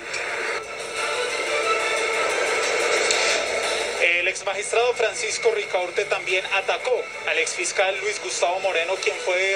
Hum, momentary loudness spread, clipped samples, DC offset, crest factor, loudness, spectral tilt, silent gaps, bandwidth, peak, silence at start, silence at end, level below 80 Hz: none; 6 LU; under 0.1%; under 0.1%; 20 dB; -22 LUFS; 0 dB/octave; none; 15.5 kHz; -2 dBFS; 0 s; 0 s; -64 dBFS